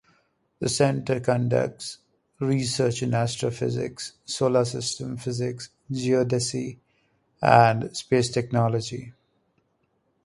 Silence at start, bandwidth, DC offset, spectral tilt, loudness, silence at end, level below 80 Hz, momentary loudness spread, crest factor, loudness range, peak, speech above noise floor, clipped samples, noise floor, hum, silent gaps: 0.6 s; 11.5 kHz; under 0.1%; -5 dB/octave; -24 LUFS; 1.15 s; -58 dBFS; 12 LU; 24 dB; 4 LU; -2 dBFS; 47 dB; under 0.1%; -71 dBFS; none; none